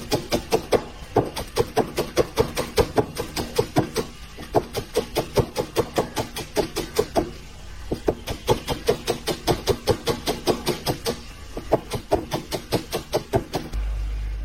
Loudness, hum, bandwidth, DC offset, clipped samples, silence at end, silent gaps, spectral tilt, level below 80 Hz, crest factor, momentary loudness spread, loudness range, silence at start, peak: -25 LUFS; none; 16.5 kHz; under 0.1%; under 0.1%; 0 s; none; -4.5 dB/octave; -36 dBFS; 20 dB; 7 LU; 2 LU; 0 s; -4 dBFS